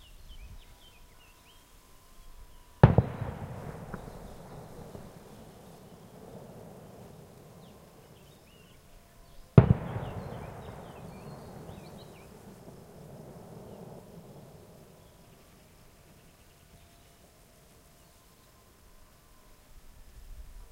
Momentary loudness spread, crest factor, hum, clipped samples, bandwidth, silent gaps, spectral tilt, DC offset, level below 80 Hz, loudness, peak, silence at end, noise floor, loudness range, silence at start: 31 LU; 34 dB; none; under 0.1%; 16 kHz; none; -8.5 dB/octave; under 0.1%; -48 dBFS; -28 LUFS; -2 dBFS; 0.05 s; -59 dBFS; 21 LU; 0.1 s